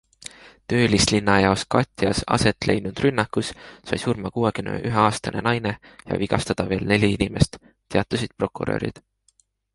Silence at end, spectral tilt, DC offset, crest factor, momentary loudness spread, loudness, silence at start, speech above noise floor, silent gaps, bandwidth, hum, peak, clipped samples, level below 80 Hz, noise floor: 0.75 s; -5 dB/octave; under 0.1%; 20 dB; 11 LU; -22 LUFS; 0.25 s; 42 dB; none; 11.5 kHz; none; -2 dBFS; under 0.1%; -42 dBFS; -64 dBFS